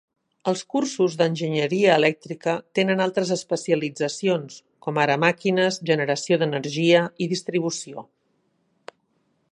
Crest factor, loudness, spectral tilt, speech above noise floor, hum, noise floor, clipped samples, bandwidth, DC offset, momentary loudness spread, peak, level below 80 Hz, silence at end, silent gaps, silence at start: 20 dB; -23 LUFS; -5 dB/octave; 47 dB; none; -69 dBFS; under 0.1%; 11 kHz; under 0.1%; 9 LU; -2 dBFS; -74 dBFS; 1.5 s; none; 0.45 s